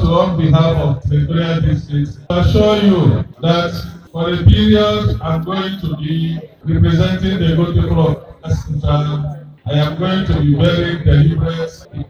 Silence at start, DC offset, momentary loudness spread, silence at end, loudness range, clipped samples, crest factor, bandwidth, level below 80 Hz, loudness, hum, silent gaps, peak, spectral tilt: 0 s; under 0.1%; 10 LU; 0.05 s; 3 LU; 0.1%; 14 dB; 7 kHz; -26 dBFS; -15 LUFS; none; none; 0 dBFS; -8 dB/octave